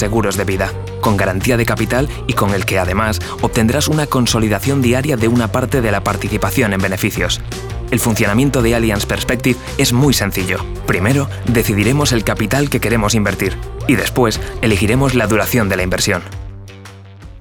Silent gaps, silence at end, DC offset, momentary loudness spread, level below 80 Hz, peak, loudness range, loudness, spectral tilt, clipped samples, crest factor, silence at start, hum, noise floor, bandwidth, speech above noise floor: none; 0 s; under 0.1%; 6 LU; -30 dBFS; -2 dBFS; 1 LU; -15 LUFS; -5 dB/octave; under 0.1%; 14 dB; 0 s; none; -35 dBFS; over 20 kHz; 20 dB